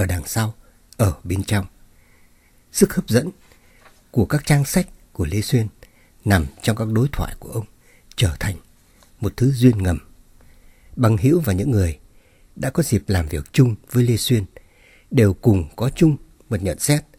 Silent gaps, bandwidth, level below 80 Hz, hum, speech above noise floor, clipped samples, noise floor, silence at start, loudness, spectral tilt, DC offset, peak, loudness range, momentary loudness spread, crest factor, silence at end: none; 17 kHz; -38 dBFS; none; 35 dB; under 0.1%; -53 dBFS; 0 s; -20 LUFS; -6 dB/octave; under 0.1%; 0 dBFS; 4 LU; 12 LU; 20 dB; 0.15 s